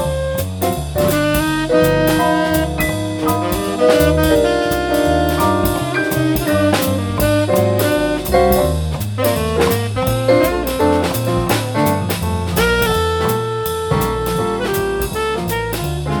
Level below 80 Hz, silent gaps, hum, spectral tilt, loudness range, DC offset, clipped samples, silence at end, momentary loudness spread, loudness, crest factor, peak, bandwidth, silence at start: -30 dBFS; none; none; -5.5 dB/octave; 2 LU; under 0.1%; under 0.1%; 0 s; 6 LU; -16 LUFS; 16 dB; 0 dBFS; 19.5 kHz; 0 s